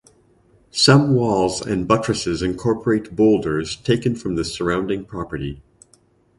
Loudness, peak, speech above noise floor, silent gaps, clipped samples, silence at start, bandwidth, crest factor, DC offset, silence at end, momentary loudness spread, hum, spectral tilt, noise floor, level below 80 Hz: -19 LUFS; 0 dBFS; 38 dB; none; under 0.1%; 0.75 s; 11.5 kHz; 20 dB; under 0.1%; 0.8 s; 14 LU; none; -5.5 dB/octave; -57 dBFS; -44 dBFS